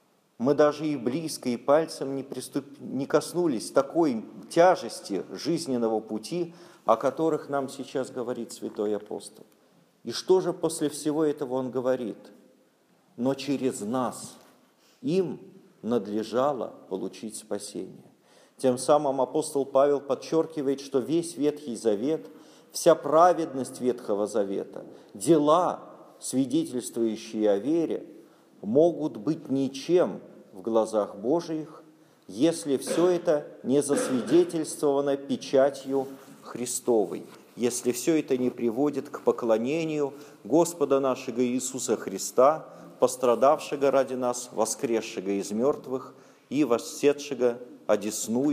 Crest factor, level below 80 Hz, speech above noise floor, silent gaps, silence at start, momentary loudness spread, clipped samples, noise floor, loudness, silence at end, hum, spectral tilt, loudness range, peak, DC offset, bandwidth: 20 dB; -80 dBFS; 37 dB; none; 0.4 s; 12 LU; under 0.1%; -64 dBFS; -27 LUFS; 0 s; none; -5 dB/octave; 5 LU; -6 dBFS; under 0.1%; 15.5 kHz